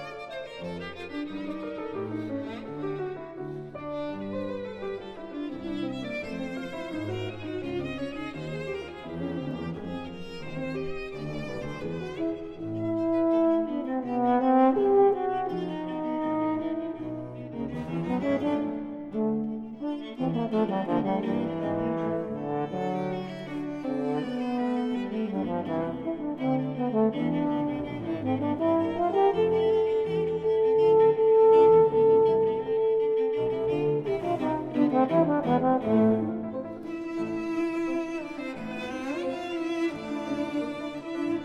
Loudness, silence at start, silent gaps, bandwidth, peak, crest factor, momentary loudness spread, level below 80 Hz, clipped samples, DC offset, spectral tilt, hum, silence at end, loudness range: -28 LUFS; 0 s; none; 8.2 kHz; -10 dBFS; 18 dB; 14 LU; -58 dBFS; under 0.1%; under 0.1%; -8 dB/octave; none; 0 s; 13 LU